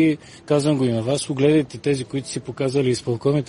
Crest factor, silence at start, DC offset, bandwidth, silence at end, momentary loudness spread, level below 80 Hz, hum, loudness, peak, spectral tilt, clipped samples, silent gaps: 16 dB; 0 s; under 0.1%; 11 kHz; 0 s; 9 LU; -56 dBFS; none; -21 LUFS; -4 dBFS; -6 dB/octave; under 0.1%; none